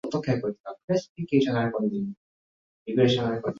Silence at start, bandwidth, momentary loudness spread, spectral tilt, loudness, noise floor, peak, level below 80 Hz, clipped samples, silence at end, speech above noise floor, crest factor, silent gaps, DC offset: 0.05 s; 7.6 kHz; 12 LU; -7 dB/octave; -26 LUFS; under -90 dBFS; -8 dBFS; -62 dBFS; under 0.1%; 0 s; over 64 dB; 20 dB; 0.60-0.64 s, 0.84-0.88 s, 1.09-1.15 s, 2.17-2.86 s; under 0.1%